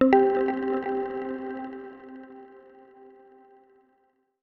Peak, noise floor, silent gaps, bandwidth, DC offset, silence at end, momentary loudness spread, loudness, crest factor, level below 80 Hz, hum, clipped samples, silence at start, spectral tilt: -6 dBFS; -69 dBFS; none; 5.6 kHz; under 0.1%; 1.85 s; 25 LU; -27 LUFS; 22 dB; -64 dBFS; none; under 0.1%; 0 s; -8 dB/octave